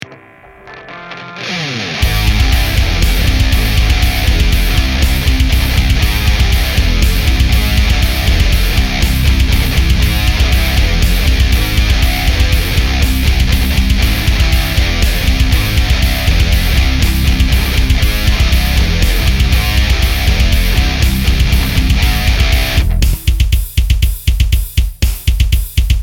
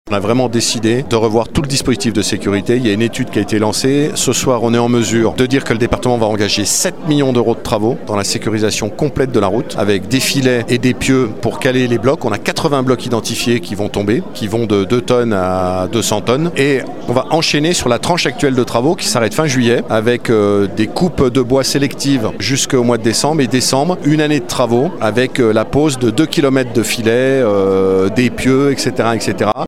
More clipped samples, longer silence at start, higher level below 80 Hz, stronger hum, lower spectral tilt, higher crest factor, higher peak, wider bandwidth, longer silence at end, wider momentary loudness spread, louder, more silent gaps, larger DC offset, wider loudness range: neither; about the same, 0 s vs 0.05 s; first, -12 dBFS vs -40 dBFS; neither; about the same, -4.5 dB/octave vs -4.5 dB/octave; about the same, 10 dB vs 14 dB; about the same, 0 dBFS vs 0 dBFS; about the same, 17.5 kHz vs 16.5 kHz; about the same, 0 s vs 0 s; about the same, 3 LU vs 4 LU; about the same, -13 LUFS vs -14 LUFS; neither; second, under 0.1% vs 3%; about the same, 1 LU vs 2 LU